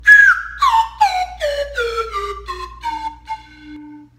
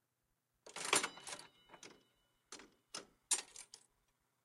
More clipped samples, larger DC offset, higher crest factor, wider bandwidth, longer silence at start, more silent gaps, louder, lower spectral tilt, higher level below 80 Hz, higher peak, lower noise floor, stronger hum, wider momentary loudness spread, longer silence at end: neither; neither; second, 16 dB vs 30 dB; about the same, 16 kHz vs 15.5 kHz; second, 0 s vs 0.65 s; neither; first, -15 LUFS vs -40 LUFS; first, -2 dB/octave vs 0.5 dB/octave; first, -40 dBFS vs -84 dBFS; first, 0 dBFS vs -16 dBFS; second, -37 dBFS vs -85 dBFS; first, 60 Hz at -55 dBFS vs none; second, 20 LU vs 23 LU; second, 0.2 s vs 0.65 s